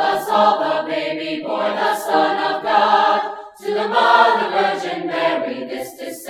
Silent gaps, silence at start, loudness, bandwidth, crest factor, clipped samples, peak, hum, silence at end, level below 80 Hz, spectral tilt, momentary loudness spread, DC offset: none; 0 s; -17 LUFS; 17.5 kHz; 18 dB; under 0.1%; 0 dBFS; none; 0 s; -68 dBFS; -3.5 dB/octave; 12 LU; under 0.1%